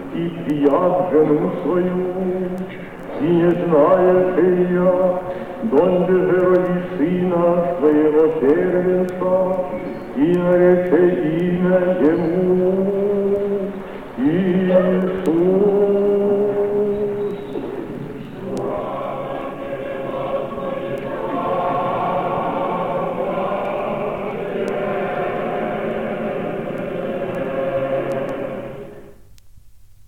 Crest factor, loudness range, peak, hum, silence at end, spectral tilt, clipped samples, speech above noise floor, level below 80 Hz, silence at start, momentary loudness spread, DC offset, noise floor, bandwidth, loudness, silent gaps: 16 dB; 8 LU; -2 dBFS; none; 0.5 s; -9 dB/octave; under 0.1%; 30 dB; -48 dBFS; 0 s; 12 LU; 0.6%; -46 dBFS; 4.9 kHz; -19 LUFS; none